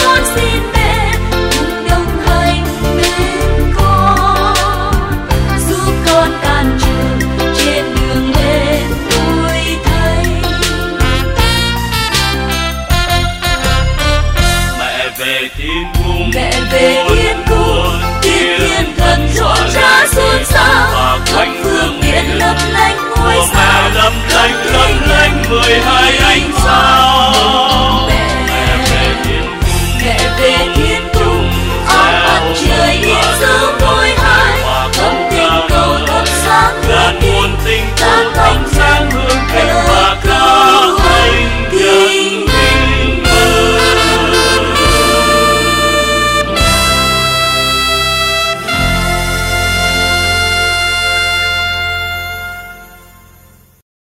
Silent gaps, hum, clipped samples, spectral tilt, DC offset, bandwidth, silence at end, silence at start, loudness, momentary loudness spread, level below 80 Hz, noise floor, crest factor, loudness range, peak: none; none; under 0.1%; -3.5 dB/octave; under 0.1%; 16.5 kHz; 1.2 s; 0 s; -10 LUFS; 6 LU; -18 dBFS; -42 dBFS; 10 dB; 4 LU; 0 dBFS